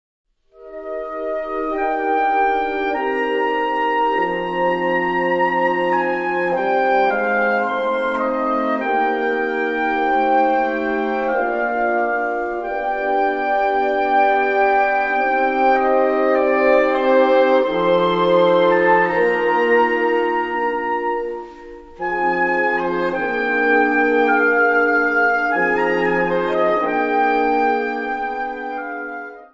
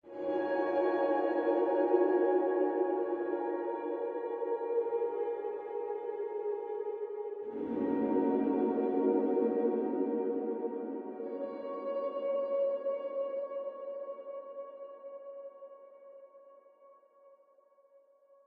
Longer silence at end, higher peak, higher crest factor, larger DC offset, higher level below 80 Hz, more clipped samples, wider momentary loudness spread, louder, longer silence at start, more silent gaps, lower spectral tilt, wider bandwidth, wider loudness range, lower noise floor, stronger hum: second, 0.1 s vs 1.2 s; first, -2 dBFS vs -14 dBFS; about the same, 16 dB vs 18 dB; neither; first, -48 dBFS vs -80 dBFS; neither; second, 8 LU vs 15 LU; first, -18 LUFS vs -33 LUFS; first, 0.6 s vs 0.05 s; neither; second, -6.5 dB/octave vs -9 dB/octave; first, 7.4 kHz vs 4.5 kHz; second, 4 LU vs 16 LU; second, -41 dBFS vs -65 dBFS; neither